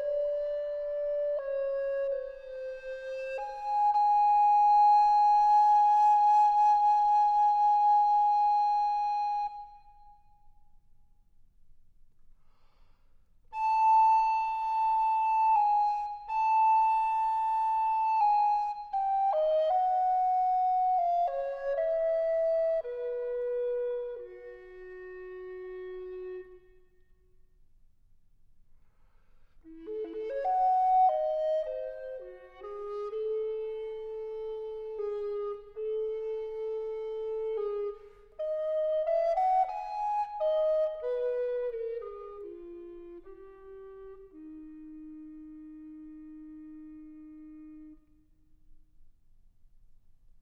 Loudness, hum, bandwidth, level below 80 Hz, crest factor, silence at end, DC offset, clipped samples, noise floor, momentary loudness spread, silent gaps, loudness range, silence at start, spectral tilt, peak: -28 LUFS; none; 6.6 kHz; -62 dBFS; 12 dB; 1.4 s; under 0.1%; under 0.1%; -62 dBFS; 24 LU; none; 23 LU; 0 s; -4.5 dB/octave; -18 dBFS